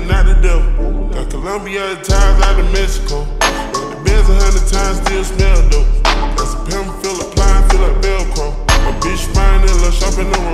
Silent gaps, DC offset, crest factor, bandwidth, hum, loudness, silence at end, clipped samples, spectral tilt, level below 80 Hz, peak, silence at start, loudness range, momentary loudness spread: none; under 0.1%; 10 dB; 12.5 kHz; none; -15 LUFS; 0 s; under 0.1%; -4.5 dB/octave; -12 dBFS; 0 dBFS; 0 s; 1 LU; 7 LU